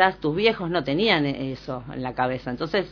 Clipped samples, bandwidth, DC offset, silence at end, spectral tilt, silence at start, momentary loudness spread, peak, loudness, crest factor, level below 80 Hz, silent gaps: under 0.1%; 5.4 kHz; under 0.1%; 0 s; -7 dB/octave; 0 s; 11 LU; -2 dBFS; -24 LUFS; 22 dB; -50 dBFS; none